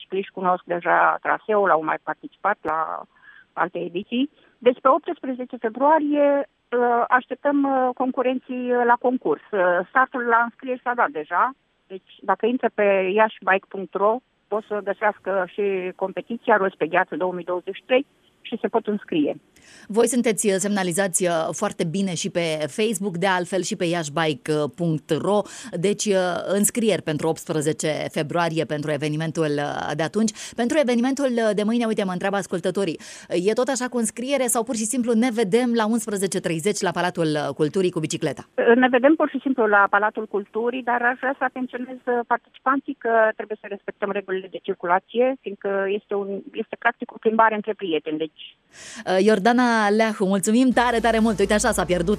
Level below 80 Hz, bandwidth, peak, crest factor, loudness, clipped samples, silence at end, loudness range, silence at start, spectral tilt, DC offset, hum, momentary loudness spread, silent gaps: -54 dBFS; 14.5 kHz; -4 dBFS; 18 dB; -22 LUFS; under 0.1%; 0 s; 4 LU; 0 s; -4.5 dB/octave; under 0.1%; none; 10 LU; none